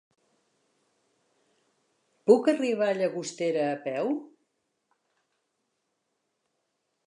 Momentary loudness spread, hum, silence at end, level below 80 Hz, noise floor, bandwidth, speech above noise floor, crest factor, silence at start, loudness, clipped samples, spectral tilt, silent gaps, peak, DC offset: 10 LU; none; 2.8 s; -88 dBFS; -79 dBFS; 11 kHz; 54 dB; 24 dB; 2.25 s; -27 LUFS; under 0.1%; -5 dB/octave; none; -6 dBFS; under 0.1%